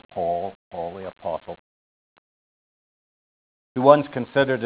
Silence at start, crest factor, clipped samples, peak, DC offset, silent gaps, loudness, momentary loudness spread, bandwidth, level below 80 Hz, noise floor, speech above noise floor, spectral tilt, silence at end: 0.15 s; 24 dB; under 0.1%; 0 dBFS; under 0.1%; 0.55-0.71 s, 1.59-3.75 s; -23 LUFS; 17 LU; 4 kHz; -60 dBFS; under -90 dBFS; over 71 dB; -10 dB/octave; 0 s